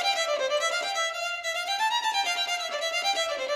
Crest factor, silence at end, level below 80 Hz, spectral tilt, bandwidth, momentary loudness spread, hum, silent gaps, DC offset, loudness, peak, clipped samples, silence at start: 14 dB; 0 s; -72 dBFS; 2.5 dB/octave; 15.5 kHz; 3 LU; none; none; under 0.1%; -26 LUFS; -14 dBFS; under 0.1%; 0 s